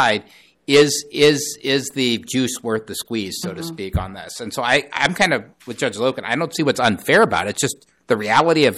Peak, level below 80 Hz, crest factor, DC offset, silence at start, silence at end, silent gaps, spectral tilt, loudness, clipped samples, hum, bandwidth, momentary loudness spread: -4 dBFS; -42 dBFS; 16 dB; under 0.1%; 0 s; 0 s; none; -3.5 dB/octave; -19 LUFS; under 0.1%; none; 15.5 kHz; 12 LU